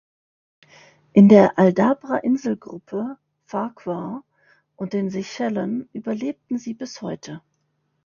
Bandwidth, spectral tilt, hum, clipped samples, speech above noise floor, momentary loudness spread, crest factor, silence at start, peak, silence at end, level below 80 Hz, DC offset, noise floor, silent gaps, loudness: 7.2 kHz; -8 dB/octave; none; under 0.1%; 51 dB; 19 LU; 22 dB; 1.15 s; 0 dBFS; 0.65 s; -64 dBFS; under 0.1%; -71 dBFS; none; -21 LUFS